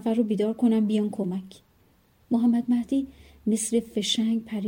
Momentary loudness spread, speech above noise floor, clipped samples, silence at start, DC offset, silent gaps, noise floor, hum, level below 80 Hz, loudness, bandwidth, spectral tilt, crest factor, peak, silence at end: 8 LU; 37 dB; under 0.1%; 0 s; under 0.1%; none; -62 dBFS; none; -62 dBFS; -25 LUFS; 16.5 kHz; -5 dB/octave; 14 dB; -10 dBFS; 0 s